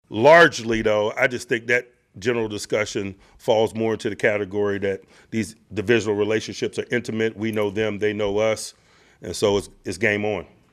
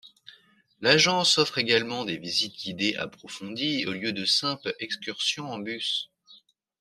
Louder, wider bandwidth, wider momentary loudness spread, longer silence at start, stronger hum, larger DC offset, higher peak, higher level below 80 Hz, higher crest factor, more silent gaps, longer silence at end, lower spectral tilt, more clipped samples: first, -22 LUFS vs -25 LUFS; about the same, 14.5 kHz vs 14 kHz; second, 10 LU vs 14 LU; about the same, 0.1 s vs 0.05 s; neither; neither; first, -2 dBFS vs -6 dBFS; first, -52 dBFS vs -70 dBFS; about the same, 20 dB vs 22 dB; neither; second, 0.3 s vs 0.45 s; first, -4.5 dB/octave vs -2.5 dB/octave; neither